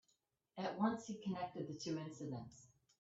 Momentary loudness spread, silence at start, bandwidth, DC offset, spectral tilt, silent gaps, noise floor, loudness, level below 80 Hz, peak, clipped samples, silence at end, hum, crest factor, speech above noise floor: 16 LU; 0.55 s; 8 kHz; under 0.1%; -6 dB/octave; none; -83 dBFS; -44 LUFS; -80 dBFS; -24 dBFS; under 0.1%; 0.35 s; none; 22 dB; 39 dB